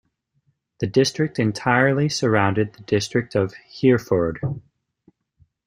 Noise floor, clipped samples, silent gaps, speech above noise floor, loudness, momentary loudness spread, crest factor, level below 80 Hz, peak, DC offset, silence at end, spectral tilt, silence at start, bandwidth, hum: -68 dBFS; under 0.1%; none; 48 dB; -21 LUFS; 10 LU; 20 dB; -54 dBFS; -2 dBFS; under 0.1%; 1.1 s; -5.5 dB/octave; 0.8 s; 16 kHz; none